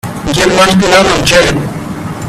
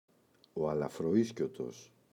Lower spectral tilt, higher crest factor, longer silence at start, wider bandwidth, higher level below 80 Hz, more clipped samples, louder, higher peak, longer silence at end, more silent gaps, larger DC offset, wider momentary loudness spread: second, -4 dB/octave vs -7 dB/octave; second, 10 dB vs 18 dB; second, 0.05 s vs 0.55 s; about the same, 15 kHz vs 14.5 kHz; first, -30 dBFS vs -68 dBFS; first, 0.2% vs under 0.1%; first, -8 LUFS vs -35 LUFS; first, 0 dBFS vs -18 dBFS; second, 0 s vs 0.3 s; neither; neither; about the same, 13 LU vs 14 LU